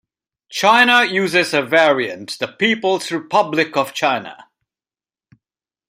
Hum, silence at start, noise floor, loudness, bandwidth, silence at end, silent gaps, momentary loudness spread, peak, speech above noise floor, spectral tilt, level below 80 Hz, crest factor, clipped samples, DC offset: none; 0.5 s; under -90 dBFS; -16 LUFS; 16 kHz; 1.55 s; none; 13 LU; -2 dBFS; over 73 dB; -3.5 dB/octave; -66 dBFS; 18 dB; under 0.1%; under 0.1%